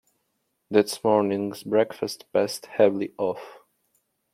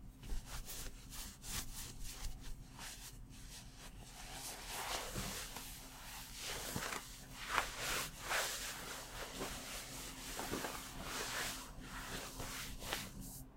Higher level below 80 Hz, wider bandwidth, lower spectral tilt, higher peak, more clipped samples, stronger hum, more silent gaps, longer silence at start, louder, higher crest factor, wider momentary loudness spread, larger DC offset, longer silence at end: second, -74 dBFS vs -54 dBFS; about the same, 16 kHz vs 16 kHz; first, -5 dB/octave vs -2 dB/octave; first, -4 dBFS vs -14 dBFS; neither; neither; neither; first, 0.7 s vs 0 s; first, -24 LUFS vs -44 LUFS; second, 22 dB vs 32 dB; second, 7 LU vs 12 LU; neither; first, 0.8 s vs 0 s